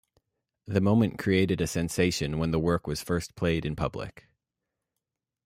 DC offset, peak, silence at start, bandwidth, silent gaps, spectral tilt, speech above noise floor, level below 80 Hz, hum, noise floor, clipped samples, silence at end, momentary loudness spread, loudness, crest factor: under 0.1%; -10 dBFS; 0.65 s; 16 kHz; none; -6 dB/octave; 60 dB; -50 dBFS; none; -86 dBFS; under 0.1%; 1.35 s; 7 LU; -27 LUFS; 20 dB